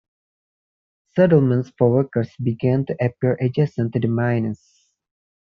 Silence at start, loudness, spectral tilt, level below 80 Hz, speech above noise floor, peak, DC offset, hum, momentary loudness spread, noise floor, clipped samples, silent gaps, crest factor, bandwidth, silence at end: 1.15 s; -20 LUFS; -9 dB/octave; -58 dBFS; over 71 dB; -2 dBFS; under 0.1%; none; 8 LU; under -90 dBFS; under 0.1%; none; 18 dB; 6.4 kHz; 1 s